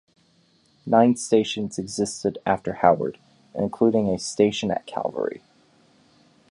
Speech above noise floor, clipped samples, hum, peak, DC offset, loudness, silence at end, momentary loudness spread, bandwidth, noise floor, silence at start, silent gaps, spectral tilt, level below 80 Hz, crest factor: 39 dB; under 0.1%; none; -2 dBFS; under 0.1%; -23 LUFS; 1.15 s; 11 LU; 11.5 kHz; -61 dBFS; 0.85 s; none; -5 dB/octave; -58 dBFS; 22 dB